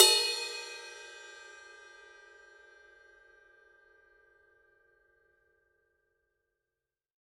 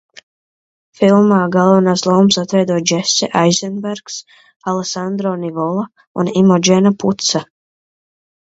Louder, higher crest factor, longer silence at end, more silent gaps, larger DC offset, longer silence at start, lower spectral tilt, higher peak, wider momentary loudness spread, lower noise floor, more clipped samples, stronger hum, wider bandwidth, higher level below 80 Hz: second, -29 LUFS vs -14 LUFS; first, 32 dB vs 16 dB; first, 5.9 s vs 1.1 s; second, none vs 4.56-4.60 s, 6.07-6.15 s; neither; second, 0 s vs 1 s; second, 2.5 dB/octave vs -5 dB/octave; second, -4 dBFS vs 0 dBFS; first, 27 LU vs 12 LU; about the same, under -90 dBFS vs under -90 dBFS; neither; neither; first, 13 kHz vs 8 kHz; second, -82 dBFS vs -60 dBFS